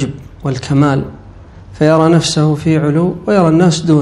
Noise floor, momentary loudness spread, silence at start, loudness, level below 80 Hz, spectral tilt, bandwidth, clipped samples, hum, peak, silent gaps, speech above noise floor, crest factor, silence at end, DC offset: -35 dBFS; 11 LU; 0 s; -12 LUFS; -40 dBFS; -6.5 dB/octave; 11.5 kHz; 0.4%; none; 0 dBFS; none; 24 dB; 12 dB; 0 s; under 0.1%